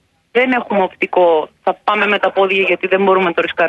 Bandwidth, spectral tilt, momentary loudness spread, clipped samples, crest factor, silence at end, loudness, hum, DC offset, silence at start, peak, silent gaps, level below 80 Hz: 7 kHz; -6.5 dB/octave; 5 LU; under 0.1%; 14 dB; 0 s; -14 LUFS; none; under 0.1%; 0.35 s; -2 dBFS; none; -60 dBFS